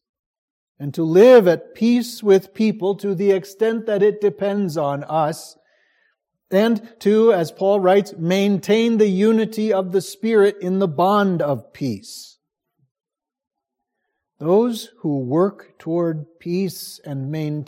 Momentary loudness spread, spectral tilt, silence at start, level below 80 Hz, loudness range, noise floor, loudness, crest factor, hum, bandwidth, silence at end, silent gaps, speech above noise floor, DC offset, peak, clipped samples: 12 LU; -6.5 dB/octave; 0.8 s; -72 dBFS; 8 LU; -80 dBFS; -18 LUFS; 18 dB; none; 16.5 kHz; 0.05 s; 12.91-12.95 s; 62 dB; under 0.1%; -2 dBFS; under 0.1%